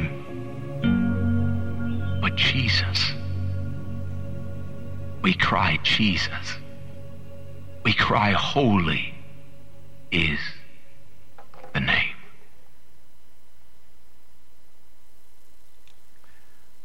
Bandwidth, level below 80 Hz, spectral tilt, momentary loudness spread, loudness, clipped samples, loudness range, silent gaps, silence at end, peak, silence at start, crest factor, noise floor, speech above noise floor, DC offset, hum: 9.8 kHz; -48 dBFS; -5.5 dB/octave; 19 LU; -24 LUFS; under 0.1%; 7 LU; none; 4.6 s; -6 dBFS; 0 s; 20 dB; -60 dBFS; 38 dB; 3%; none